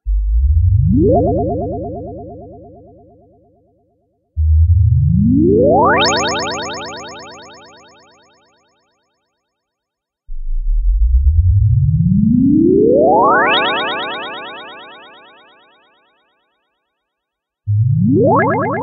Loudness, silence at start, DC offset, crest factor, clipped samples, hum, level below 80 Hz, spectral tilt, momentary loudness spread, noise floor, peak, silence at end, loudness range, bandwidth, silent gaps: -13 LUFS; 0.05 s; under 0.1%; 14 dB; under 0.1%; none; -22 dBFS; -6.5 dB/octave; 20 LU; -80 dBFS; 0 dBFS; 0 s; 15 LU; 7.2 kHz; none